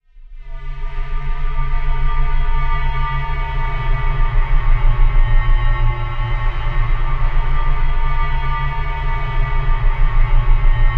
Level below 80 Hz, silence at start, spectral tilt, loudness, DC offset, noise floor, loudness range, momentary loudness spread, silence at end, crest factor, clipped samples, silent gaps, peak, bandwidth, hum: -14 dBFS; 0.2 s; -7.5 dB/octave; -22 LUFS; under 0.1%; -34 dBFS; 3 LU; 7 LU; 0 s; 12 dB; under 0.1%; none; -2 dBFS; 4 kHz; none